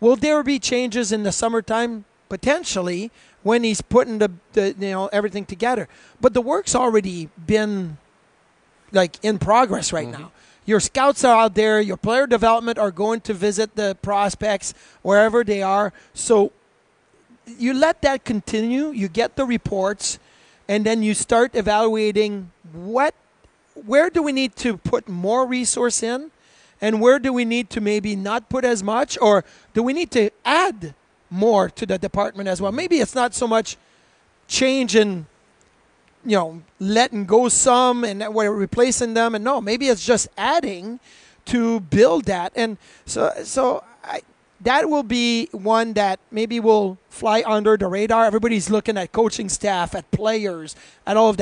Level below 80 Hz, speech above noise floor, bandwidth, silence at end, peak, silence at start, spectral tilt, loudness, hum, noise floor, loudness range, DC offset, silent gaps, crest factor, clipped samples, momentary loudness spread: -50 dBFS; 40 dB; 10.5 kHz; 0 s; -2 dBFS; 0 s; -4 dB/octave; -20 LUFS; none; -60 dBFS; 4 LU; under 0.1%; none; 18 dB; under 0.1%; 11 LU